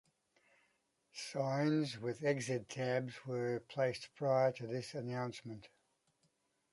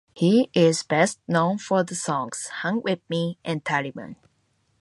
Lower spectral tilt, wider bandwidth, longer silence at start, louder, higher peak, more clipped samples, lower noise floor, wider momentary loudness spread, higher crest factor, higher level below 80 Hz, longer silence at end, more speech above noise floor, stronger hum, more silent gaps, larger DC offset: about the same, -6 dB/octave vs -5 dB/octave; about the same, 11.5 kHz vs 11.5 kHz; first, 1.15 s vs 0.15 s; second, -38 LUFS vs -23 LUFS; second, -22 dBFS vs -4 dBFS; neither; first, -79 dBFS vs -68 dBFS; about the same, 11 LU vs 10 LU; about the same, 18 dB vs 20 dB; second, -80 dBFS vs -68 dBFS; first, 1.05 s vs 0.65 s; about the same, 42 dB vs 45 dB; neither; neither; neither